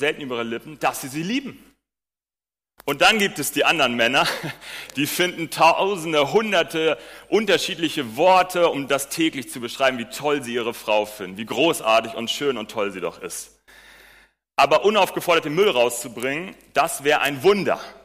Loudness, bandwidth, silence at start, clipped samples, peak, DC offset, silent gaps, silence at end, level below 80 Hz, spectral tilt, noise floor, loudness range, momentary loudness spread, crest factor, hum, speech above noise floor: -21 LUFS; 15.5 kHz; 0 s; under 0.1%; -6 dBFS; under 0.1%; none; 0.1 s; -60 dBFS; -3 dB/octave; under -90 dBFS; 4 LU; 13 LU; 16 dB; none; over 69 dB